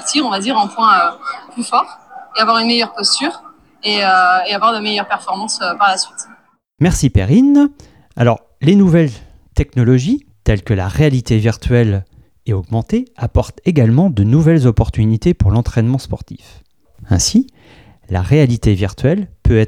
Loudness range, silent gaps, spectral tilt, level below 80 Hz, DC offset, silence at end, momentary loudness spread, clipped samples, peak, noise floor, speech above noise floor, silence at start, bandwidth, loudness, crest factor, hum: 3 LU; none; -5.5 dB/octave; -30 dBFS; 0.1%; 0 s; 11 LU; under 0.1%; 0 dBFS; -41 dBFS; 28 dB; 0 s; 13.5 kHz; -14 LUFS; 14 dB; none